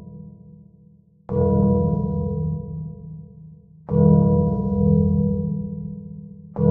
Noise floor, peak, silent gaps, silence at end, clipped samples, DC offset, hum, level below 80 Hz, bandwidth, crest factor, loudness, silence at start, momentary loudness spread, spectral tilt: -52 dBFS; -2 dBFS; none; 0 s; under 0.1%; under 0.1%; none; -38 dBFS; 1.5 kHz; 18 dB; -21 LUFS; 0 s; 21 LU; -14.5 dB/octave